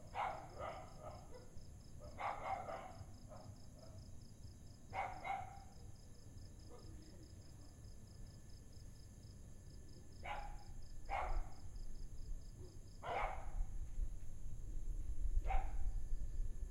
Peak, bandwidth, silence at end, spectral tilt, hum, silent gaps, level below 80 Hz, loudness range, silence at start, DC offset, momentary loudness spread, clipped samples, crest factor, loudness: -24 dBFS; 11.5 kHz; 0 s; -5 dB/octave; none; none; -48 dBFS; 10 LU; 0 s; under 0.1%; 15 LU; under 0.1%; 20 dB; -51 LUFS